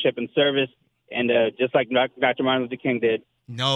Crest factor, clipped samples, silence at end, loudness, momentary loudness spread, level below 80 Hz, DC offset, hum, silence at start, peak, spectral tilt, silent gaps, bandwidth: 18 dB; under 0.1%; 0 s; -23 LUFS; 8 LU; -68 dBFS; under 0.1%; none; 0 s; -6 dBFS; -5.5 dB/octave; none; 9.4 kHz